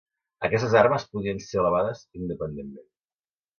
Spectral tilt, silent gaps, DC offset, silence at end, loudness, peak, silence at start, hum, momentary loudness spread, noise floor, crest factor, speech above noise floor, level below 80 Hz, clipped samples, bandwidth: -6.5 dB/octave; none; under 0.1%; 0.75 s; -25 LUFS; -6 dBFS; 0.4 s; none; 15 LU; under -90 dBFS; 22 dB; over 65 dB; -54 dBFS; under 0.1%; 7 kHz